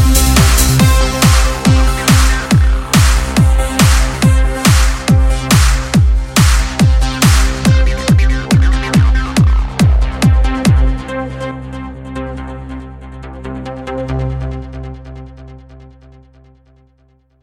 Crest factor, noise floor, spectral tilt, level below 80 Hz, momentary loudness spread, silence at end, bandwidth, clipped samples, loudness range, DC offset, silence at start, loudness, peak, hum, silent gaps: 12 dB; -53 dBFS; -5 dB/octave; -14 dBFS; 16 LU; 1.65 s; 17 kHz; under 0.1%; 14 LU; under 0.1%; 0 s; -12 LUFS; 0 dBFS; none; none